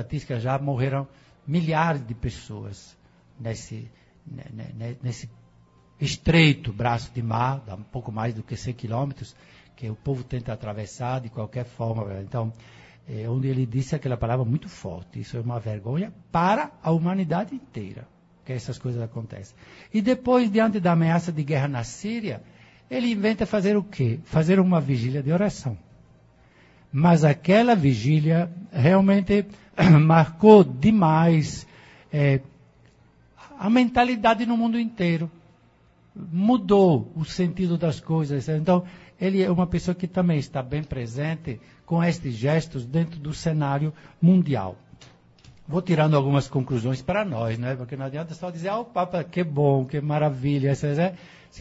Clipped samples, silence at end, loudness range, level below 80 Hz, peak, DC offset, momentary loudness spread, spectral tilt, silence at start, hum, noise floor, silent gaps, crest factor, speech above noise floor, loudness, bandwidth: under 0.1%; 0 s; 12 LU; -50 dBFS; 0 dBFS; under 0.1%; 17 LU; -7.5 dB/octave; 0 s; none; -58 dBFS; none; 24 dB; 35 dB; -23 LUFS; 8 kHz